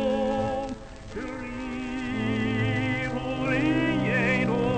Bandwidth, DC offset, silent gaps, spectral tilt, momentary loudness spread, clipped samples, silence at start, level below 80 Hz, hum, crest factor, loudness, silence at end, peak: 9 kHz; under 0.1%; none; -7 dB/octave; 12 LU; under 0.1%; 0 s; -44 dBFS; none; 16 dB; -27 LUFS; 0 s; -12 dBFS